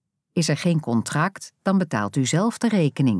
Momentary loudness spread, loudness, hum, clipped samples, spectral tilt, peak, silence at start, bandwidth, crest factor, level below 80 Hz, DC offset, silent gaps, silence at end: 4 LU; -23 LUFS; none; under 0.1%; -5.5 dB/octave; -8 dBFS; 0.35 s; 11 kHz; 16 dB; -68 dBFS; under 0.1%; none; 0 s